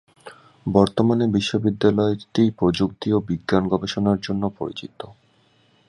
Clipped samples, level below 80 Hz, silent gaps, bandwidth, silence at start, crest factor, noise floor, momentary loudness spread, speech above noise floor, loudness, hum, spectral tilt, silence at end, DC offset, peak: under 0.1%; -48 dBFS; none; 11 kHz; 0.25 s; 20 dB; -60 dBFS; 13 LU; 39 dB; -21 LUFS; none; -7 dB/octave; 0.75 s; under 0.1%; -2 dBFS